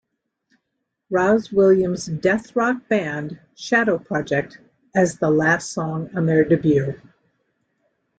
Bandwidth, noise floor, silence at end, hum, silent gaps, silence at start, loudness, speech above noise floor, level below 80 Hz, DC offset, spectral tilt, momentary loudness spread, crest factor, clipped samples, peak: 9.2 kHz; -77 dBFS; 1.2 s; none; none; 1.1 s; -20 LUFS; 58 dB; -56 dBFS; under 0.1%; -6.5 dB/octave; 11 LU; 16 dB; under 0.1%; -4 dBFS